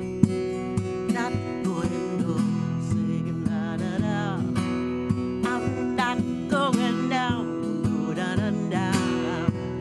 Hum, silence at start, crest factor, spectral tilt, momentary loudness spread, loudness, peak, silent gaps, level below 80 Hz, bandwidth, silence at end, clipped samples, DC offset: none; 0 s; 22 dB; -6.5 dB/octave; 4 LU; -26 LUFS; -4 dBFS; none; -50 dBFS; 12 kHz; 0 s; under 0.1%; under 0.1%